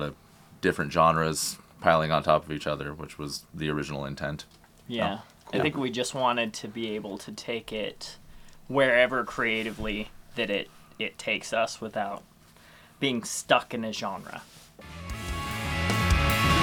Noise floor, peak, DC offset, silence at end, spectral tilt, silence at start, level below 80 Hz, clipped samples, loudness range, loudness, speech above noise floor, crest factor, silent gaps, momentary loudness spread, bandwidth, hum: -54 dBFS; -4 dBFS; under 0.1%; 0 s; -4.5 dB/octave; 0 s; -42 dBFS; under 0.1%; 5 LU; -28 LUFS; 26 dB; 24 dB; none; 15 LU; 19 kHz; none